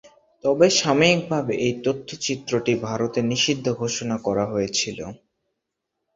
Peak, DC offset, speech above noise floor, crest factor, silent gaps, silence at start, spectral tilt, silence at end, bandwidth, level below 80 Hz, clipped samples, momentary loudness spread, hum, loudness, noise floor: -2 dBFS; under 0.1%; 58 dB; 20 dB; none; 0.45 s; -4 dB/octave; 1 s; 8 kHz; -58 dBFS; under 0.1%; 10 LU; none; -22 LUFS; -80 dBFS